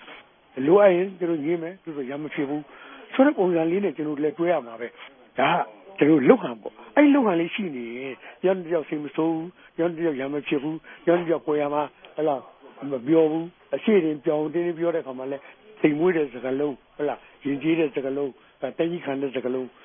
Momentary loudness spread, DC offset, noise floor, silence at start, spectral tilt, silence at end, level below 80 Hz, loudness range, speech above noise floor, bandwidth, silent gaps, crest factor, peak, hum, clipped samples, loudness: 14 LU; under 0.1%; -48 dBFS; 0 s; -11 dB/octave; 0.15 s; -72 dBFS; 5 LU; 24 dB; 3.7 kHz; none; 22 dB; -2 dBFS; none; under 0.1%; -24 LUFS